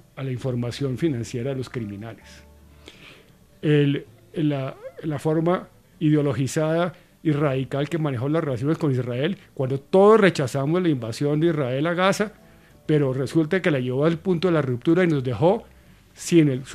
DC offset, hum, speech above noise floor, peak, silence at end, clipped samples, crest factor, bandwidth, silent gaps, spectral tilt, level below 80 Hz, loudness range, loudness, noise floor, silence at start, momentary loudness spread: under 0.1%; none; 30 dB; -4 dBFS; 0 s; under 0.1%; 20 dB; 14 kHz; none; -7 dB/octave; -58 dBFS; 7 LU; -23 LUFS; -52 dBFS; 0.15 s; 10 LU